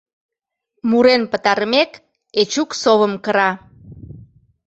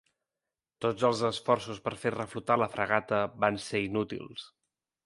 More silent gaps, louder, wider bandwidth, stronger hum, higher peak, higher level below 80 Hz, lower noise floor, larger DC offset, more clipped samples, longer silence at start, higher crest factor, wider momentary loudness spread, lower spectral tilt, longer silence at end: neither; first, -17 LUFS vs -30 LUFS; second, 8.2 kHz vs 11.5 kHz; neither; first, -2 dBFS vs -8 dBFS; first, -54 dBFS vs -64 dBFS; second, -73 dBFS vs under -90 dBFS; neither; neither; about the same, 0.85 s vs 0.8 s; second, 18 dB vs 24 dB; about the same, 9 LU vs 9 LU; second, -3.5 dB/octave vs -5 dB/octave; second, 0.45 s vs 0.6 s